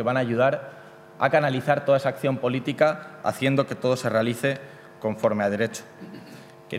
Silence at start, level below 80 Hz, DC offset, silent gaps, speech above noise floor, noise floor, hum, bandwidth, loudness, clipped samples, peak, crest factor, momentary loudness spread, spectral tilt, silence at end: 0 s; -70 dBFS; under 0.1%; none; 21 dB; -45 dBFS; none; 16 kHz; -24 LUFS; under 0.1%; -4 dBFS; 20 dB; 20 LU; -6 dB/octave; 0 s